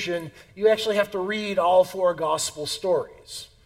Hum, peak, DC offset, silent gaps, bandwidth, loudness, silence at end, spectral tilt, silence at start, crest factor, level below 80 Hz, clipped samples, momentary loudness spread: none; -8 dBFS; under 0.1%; none; 16.5 kHz; -23 LUFS; 0.2 s; -3 dB/octave; 0 s; 16 dB; -60 dBFS; under 0.1%; 15 LU